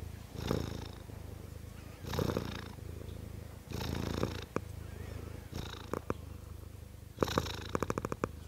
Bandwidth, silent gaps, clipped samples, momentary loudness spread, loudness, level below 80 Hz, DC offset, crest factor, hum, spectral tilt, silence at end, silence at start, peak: 16 kHz; none; under 0.1%; 13 LU; -40 LUFS; -50 dBFS; under 0.1%; 28 dB; none; -5.5 dB/octave; 0 s; 0 s; -12 dBFS